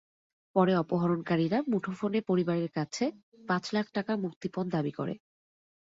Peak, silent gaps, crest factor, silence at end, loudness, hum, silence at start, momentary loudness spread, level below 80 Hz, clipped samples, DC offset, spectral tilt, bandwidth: -12 dBFS; 3.23-3.32 s, 4.36-4.41 s; 20 dB; 0.7 s; -31 LUFS; none; 0.55 s; 8 LU; -70 dBFS; under 0.1%; under 0.1%; -7 dB/octave; 7.8 kHz